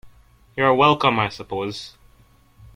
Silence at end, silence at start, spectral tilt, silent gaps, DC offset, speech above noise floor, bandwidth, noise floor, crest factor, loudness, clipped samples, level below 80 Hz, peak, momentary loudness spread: 0.85 s; 0.05 s; -5.5 dB/octave; none; under 0.1%; 35 dB; 16 kHz; -54 dBFS; 22 dB; -19 LUFS; under 0.1%; -54 dBFS; 0 dBFS; 19 LU